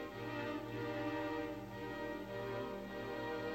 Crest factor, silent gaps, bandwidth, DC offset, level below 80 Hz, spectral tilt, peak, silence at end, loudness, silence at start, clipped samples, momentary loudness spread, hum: 14 dB; none; 16 kHz; under 0.1%; -64 dBFS; -6.5 dB/octave; -30 dBFS; 0 s; -43 LUFS; 0 s; under 0.1%; 4 LU; none